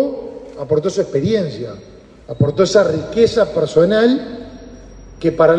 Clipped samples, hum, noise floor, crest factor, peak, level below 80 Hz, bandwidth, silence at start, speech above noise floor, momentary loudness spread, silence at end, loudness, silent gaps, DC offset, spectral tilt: under 0.1%; none; -37 dBFS; 16 dB; 0 dBFS; -44 dBFS; 9.2 kHz; 0 s; 22 dB; 19 LU; 0 s; -16 LUFS; none; under 0.1%; -6.5 dB/octave